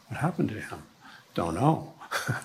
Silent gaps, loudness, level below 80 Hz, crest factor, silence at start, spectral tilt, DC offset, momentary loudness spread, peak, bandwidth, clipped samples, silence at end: none; -30 LUFS; -58 dBFS; 22 dB; 0.1 s; -6 dB/octave; under 0.1%; 15 LU; -8 dBFS; 16 kHz; under 0.1%; 0 s